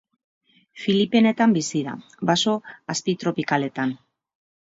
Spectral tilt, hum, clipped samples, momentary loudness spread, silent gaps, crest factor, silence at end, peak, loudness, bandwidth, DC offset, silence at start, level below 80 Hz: -4.5 dB/octave; none; under 0.1%; 11 LU; none; 18 dB; 0.75 s; -6 dBFS; -22 LUFS; 8 kHz; under 0.1%; 0.75 s; -68 dBFS